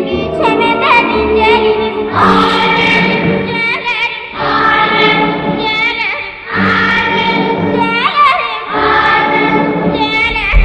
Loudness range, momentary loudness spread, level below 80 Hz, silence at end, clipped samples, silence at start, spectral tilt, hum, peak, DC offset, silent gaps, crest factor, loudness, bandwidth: 2 LU; 6 LU; -26 dBFS; 0 s; under 0.1%; 0 s; -6 dB/octave; none; 0 dBFS; under 0.1%; none; 12 dB; -11 LUFS; 9.6 kHz